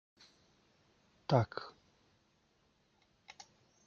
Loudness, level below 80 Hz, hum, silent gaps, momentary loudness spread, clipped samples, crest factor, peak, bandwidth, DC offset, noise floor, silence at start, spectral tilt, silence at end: -35 LUFS; -74 dBFS; none; none; 25 LU; under 0.1%; 28 dB; -14 dBFS; 7.2 kHz; under 0.1%; -74 dBFS; 1.3 s; -7 dB/octave; 2.15 s